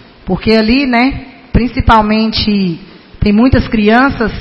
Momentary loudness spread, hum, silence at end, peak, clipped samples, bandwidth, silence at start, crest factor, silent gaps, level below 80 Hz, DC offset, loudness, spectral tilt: 8 LU; none; 0 s; 0 dBFS; 0.3%; 6.2 kHz; 0.25 s; 10 dB; none; -24 dBFS; under 0.1%; -11 LUFS; -8 dB/octave